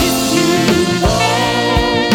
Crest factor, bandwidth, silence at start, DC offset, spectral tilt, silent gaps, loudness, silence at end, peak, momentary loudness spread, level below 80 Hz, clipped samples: 12 dB; over 20 kHz; 0 s; under 0.1%; -4 dB/octave; none; -13 LUFS; 0 s; 0 dBFS; 1 LU; -28 dBFS; under 0.1%